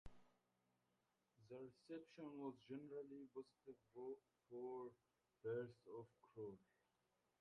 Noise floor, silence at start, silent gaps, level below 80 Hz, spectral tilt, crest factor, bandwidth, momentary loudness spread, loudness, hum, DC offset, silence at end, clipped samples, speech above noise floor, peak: -88 dBFS; 0.05 s; none; -80 dBFS; -8 dB/octave; 18 dB; 9 kHz; 12 LU; -57 LUFS; none; under 0.1%; 0.8 s; under 0.1%; 32 dB; -38 dBFS